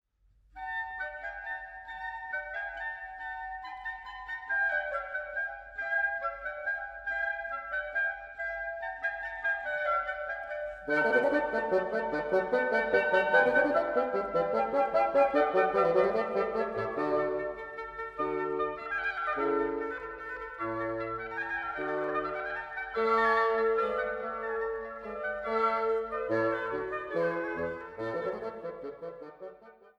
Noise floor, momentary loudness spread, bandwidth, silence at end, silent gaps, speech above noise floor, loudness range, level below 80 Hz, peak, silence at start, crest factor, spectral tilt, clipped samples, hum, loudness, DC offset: -66 dBFS; 13 LU; 8.2 kHz; 0.25 s; none; 39 dB; 8 LU; -60 dBFS; -12 dBFS; 0.55 s; 18 dB; -6 dB/octave; under 0.1%; none; -31 LUFS; under 0.1%